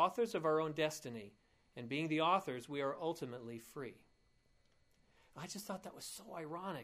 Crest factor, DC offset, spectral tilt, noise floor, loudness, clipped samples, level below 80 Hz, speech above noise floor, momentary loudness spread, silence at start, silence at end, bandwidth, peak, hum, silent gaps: 22 dB; under 0.1%; -4.5 dB/octave; -73 dBFS; -40 LUFS; under 0.1%; -78 dBFS; 33 dB; 17 LU; 0 s; 0 s; 15.5 kHz; -20 dBFS; none; none